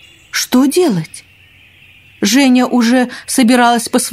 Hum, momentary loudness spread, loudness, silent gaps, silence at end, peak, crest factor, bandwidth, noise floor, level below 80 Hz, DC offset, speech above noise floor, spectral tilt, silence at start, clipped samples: none; 9 LU; -12 LUFS; none; 0 s; 0 dBFS; 14 dB; 16 kHz; -45 dBFS; -56 dBFS; under 0.1%; 33 dB; -3.5 dB/octave; 0.35 s; under 0.1%